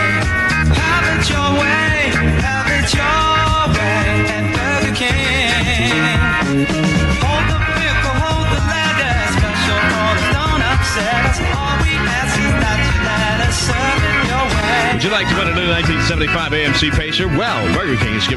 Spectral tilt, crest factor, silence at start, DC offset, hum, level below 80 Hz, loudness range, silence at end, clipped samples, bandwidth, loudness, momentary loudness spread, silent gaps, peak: -4.5 dB/octave; 12 dB; 0 s; under 0.1%; none; -24 dBFS; 1 LU; 0 s; under 0.1%; 12 kHz; -15 LUFS; 2 LU; none; -4 dBFS